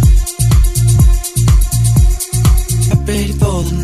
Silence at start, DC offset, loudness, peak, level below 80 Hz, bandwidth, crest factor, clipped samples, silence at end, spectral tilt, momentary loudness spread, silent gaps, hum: 0 s; under 0.1%; -13 LUFS; 0 dBFS; -14 dBFS; 16 kHz; 10 dB; under 0.1%; 0 s; -5.5 dB/octave; 4 LU; none; none